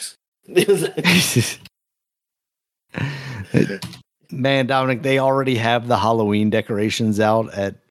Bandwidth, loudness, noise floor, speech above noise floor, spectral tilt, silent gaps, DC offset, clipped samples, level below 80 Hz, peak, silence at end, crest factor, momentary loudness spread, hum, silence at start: 16 kHz; -19 LUFS; -85 dBFS; 67 dB; -5 dB/octave; 0.28-0.32 s; under 0.1%; under 0.1%; -60 dBFS; 0 dBFS; 0.15 s; 20 dB; 14 LU; none; 0 s